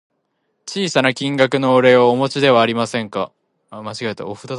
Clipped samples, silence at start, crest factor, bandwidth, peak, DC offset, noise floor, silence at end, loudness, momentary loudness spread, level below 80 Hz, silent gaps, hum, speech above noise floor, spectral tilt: under 0.1%; 0.65 s; 18 dB; 11.5 kHz; 0 dBFS; under 0.1%; -69 dBFS; 0 s; -16 LUFS; 17 LU; -62 dBFS; none; none; 53 dB; -5 dB/octave